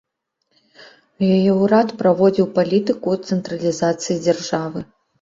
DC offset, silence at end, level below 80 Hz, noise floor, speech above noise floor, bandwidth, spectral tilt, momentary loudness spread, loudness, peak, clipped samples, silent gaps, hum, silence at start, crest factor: under 0.1%; 0.4 s; -58 dBFS; -71 dBFS; 54 dB; 7.8 kHz; -6.5 dB/octave; 8 LU; -18 LUFS; -2 dBFS; under 0.1%; none; none; 0.8 s; 16 dB